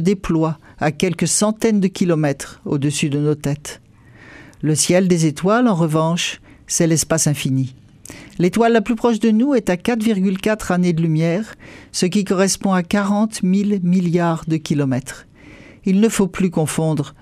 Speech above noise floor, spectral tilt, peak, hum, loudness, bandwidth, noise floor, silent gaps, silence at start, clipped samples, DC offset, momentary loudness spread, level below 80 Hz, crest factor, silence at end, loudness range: 27 dB; -5.5 dB/octave; -2 dBFS; none; -18 LUFS; 15.5 kHz; -44 dBFS; none; 0 s; under 0.1%; under 0.1%; 9 LU; -48 dBFS; 16 dB; 0.1 s; 2 LU